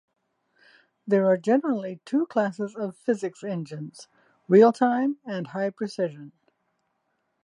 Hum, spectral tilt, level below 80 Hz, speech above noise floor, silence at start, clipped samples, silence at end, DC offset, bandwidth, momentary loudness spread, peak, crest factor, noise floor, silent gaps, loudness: none; -7.5 dB/octave; -82 dBFS; 51 dB; 1.05 s; under 0.1%; 1.15 s; under 0.1%; 11 kHz; 15 LU; -6 dBFS; 20 dB; -75 dBFS; none; -25 LUFS